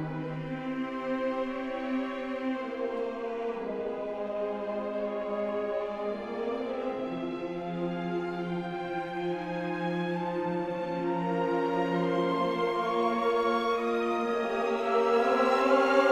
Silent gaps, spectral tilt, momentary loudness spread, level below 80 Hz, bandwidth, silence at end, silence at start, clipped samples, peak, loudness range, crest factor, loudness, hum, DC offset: none; -6.5 dB/octave; 9 LU; -64 dBFS; 12.5 kHz; 0 s; 0 s; under 0.1%; -10 dBFS; 6 LU; 20 dB; -30 LUFS; none; under 0.1%